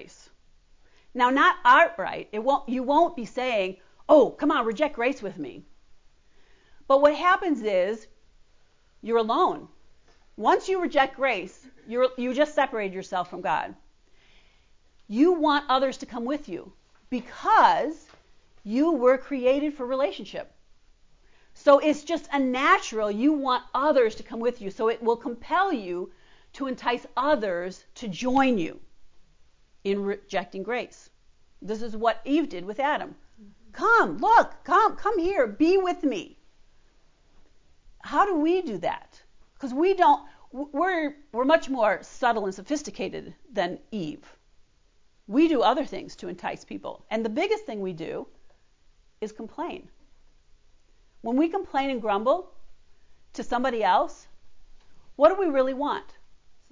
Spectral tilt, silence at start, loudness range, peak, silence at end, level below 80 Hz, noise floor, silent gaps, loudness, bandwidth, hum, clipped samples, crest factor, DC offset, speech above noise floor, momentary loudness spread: -5 dB/octave; 0 s; 7 LU; -6 dBFS; 0.2 s; -58 dBFS; -60 dBFS; none; -25 LUFS; 7.6 kHz; none; under 0.1%; 20 dB; under 0.1%; 36 dB; 17 LU